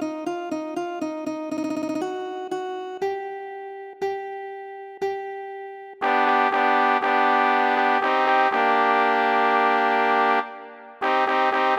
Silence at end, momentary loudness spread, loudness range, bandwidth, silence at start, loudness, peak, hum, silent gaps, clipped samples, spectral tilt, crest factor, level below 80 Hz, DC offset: 0 s; 16 LU; 11 LU; 16.5 kHz; 0 s; -22 LUFS; -4 dBFS; none; none; under 0.1%; -3.5 dB/octave; 18 dB; -72 dBFS; under 0.1%